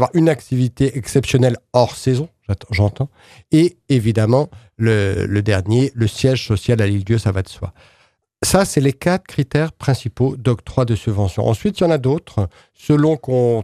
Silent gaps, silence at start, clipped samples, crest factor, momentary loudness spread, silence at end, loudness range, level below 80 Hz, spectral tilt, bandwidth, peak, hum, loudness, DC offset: none; 0 s; under 0.1%; 16 dB; 7 LU; 0 s; 2 LU; -44 dBFS; -6.5 dB/octave; 14.5 kHz; 0 dBFS; none; -18 LUFS; under 0.1%